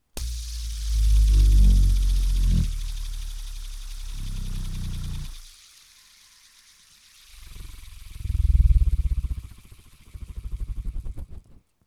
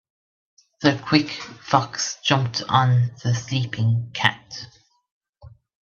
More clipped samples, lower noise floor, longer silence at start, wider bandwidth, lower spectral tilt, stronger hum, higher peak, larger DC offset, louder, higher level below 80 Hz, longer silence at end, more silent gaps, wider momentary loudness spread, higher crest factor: neither; first, -55 dBFS vs -48 dBFS; second, 0.15 s vs 0.8 s; first, 13 kHz vs 7.2 kHz; about the same, -5.5 dB/octave vs -5 dB/octave; neither; second, -8 dBFS vs 0 dBFS; neither; second, -26 LUFS vs -21 LUFS; first, -24 dBFS vs -60 dBFS; about the same, 0.3 s vs 0.35 s; second, none vs 5.11-5.21 s, 5.29-5.33 s; first, 24 LU vs 15 LU; second, 16 dB vs 22 dB